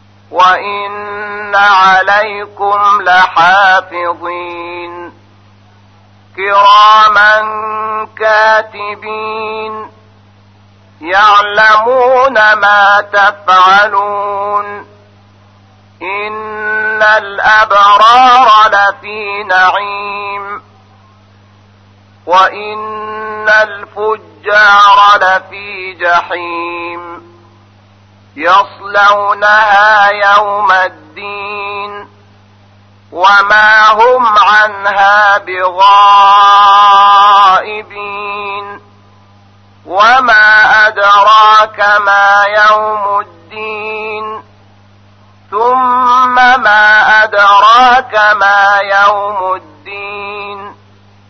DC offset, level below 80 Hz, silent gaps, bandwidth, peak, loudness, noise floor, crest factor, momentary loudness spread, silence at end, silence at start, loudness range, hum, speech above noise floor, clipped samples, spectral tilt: under 0.1%; -50 dBFS; none; 6.6 kHz; 0 dBFS; -7 LUFS; -42 dBFS; 10 dB; 17 LU; 0.6 s; 0.3 s; 9 LU; none; 34 dB; 0.2%; -2 dB/octave